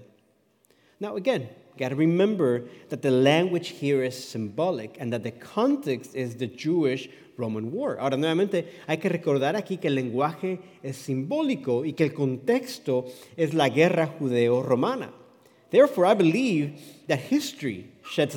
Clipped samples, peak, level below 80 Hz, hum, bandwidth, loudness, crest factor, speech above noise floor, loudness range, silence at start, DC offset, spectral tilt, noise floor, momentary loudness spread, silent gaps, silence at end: under 0.1%; -6 dBFS; -80 dBFS; none; 18 kHz; -26 LUFS; 20 dB; 40 dB; 4 LU; 1 s; under 0.1%; -6.5 dB/octave; -65 dBFS; 13 LU; none; 0 s